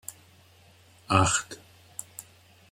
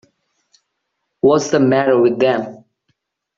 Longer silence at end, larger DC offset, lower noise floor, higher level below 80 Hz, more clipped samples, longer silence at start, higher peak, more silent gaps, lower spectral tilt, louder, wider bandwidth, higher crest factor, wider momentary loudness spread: second, 0.5 s vs 0.85 s; neither; second, -57 dBFS vs -74 dBFS; about the same, -60 dBFS vs -58 dBFS; neither; second, 0.1 s vs 1.25 s; second, -6 dBFS vs -2 dBFS; neither; second, -3.5 dB/octave vs -6 dB/octave; second, -25 LUFS vs -15 LUFS; first, 16.5 kHz vs 7.6 kHz; first, 26 dB vs 16 dB; first, 23 LU vs 7 LU